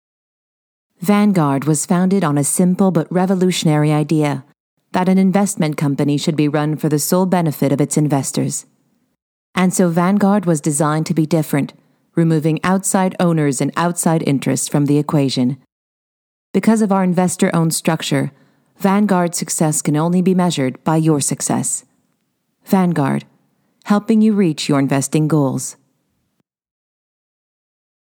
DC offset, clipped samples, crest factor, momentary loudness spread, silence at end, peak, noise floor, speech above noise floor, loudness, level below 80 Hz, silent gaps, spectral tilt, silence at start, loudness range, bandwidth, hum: under 0.1%; under 0.1%; 16 dB; 6 LU; 2.35 s; 0 dBFS; -69 dBFS; 54 dB; -16 LUFS; -66 dBFS; 4.60-4.77 s, 9.22-9.53 s, 15.72-16.54 s; -5.5 dB/octave; 1 s; 2 LU; 19.5 kHz; none